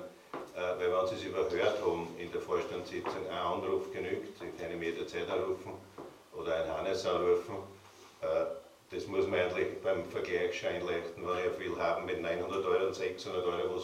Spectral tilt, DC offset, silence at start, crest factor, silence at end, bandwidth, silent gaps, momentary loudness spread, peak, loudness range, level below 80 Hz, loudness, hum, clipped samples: -5 dB/octave; under 0.1%; 0 s; 18 dB; 0 s; 15.5 kHz; none; 12 LU; -16 dBFS; 3 LU; -66 dBFS; -35 LUFS; none; under 0.1%